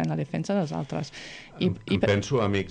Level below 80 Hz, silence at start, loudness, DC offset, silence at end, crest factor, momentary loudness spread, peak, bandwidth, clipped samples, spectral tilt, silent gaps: -54 dBFS; 0 s; -27 LUFS; under 0.1%; 0 s; 18 dB; 12 LU; -8 dBFS; 9.8 kHz; under 0.1%; -6.5 dB/octave; none